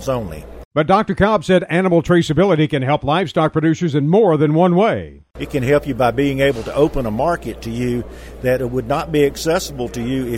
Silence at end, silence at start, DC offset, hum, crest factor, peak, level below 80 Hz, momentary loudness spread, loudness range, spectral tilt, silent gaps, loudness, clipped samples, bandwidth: 0 s; 0 s; under 0.1%; none; 16 dB; 0 dBFS; -36 dBFS; 10 LU; 4 LU; -6.5 dB/octave; 0.65-0.71 s; -17 LUFS; under 0.1%; 16 kHz